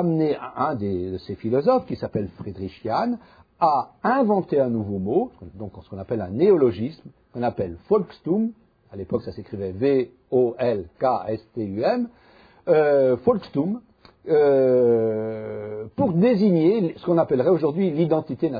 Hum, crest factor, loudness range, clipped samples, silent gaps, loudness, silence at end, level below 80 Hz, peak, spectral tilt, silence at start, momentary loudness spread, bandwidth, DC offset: none; 16 dB; 5 LU; under 0.1%; none; -22 LUFS; 0 s; -58 dBFS; -6 dBFS; -10.5 dB/octave; 0 s; 14 LU; 5 kHz; under 0.1%